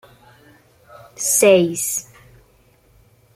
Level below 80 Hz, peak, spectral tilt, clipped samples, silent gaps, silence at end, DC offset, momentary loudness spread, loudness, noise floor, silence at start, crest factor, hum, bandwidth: -60 dBFS; -2 dBFS; -3 dB/octave; under 0.1%; none; 1.35 s; under 0.1%; 11 LU; -16 LUFS; -55 dBFS; 1.2 s; 20 dB; none; 16 kHz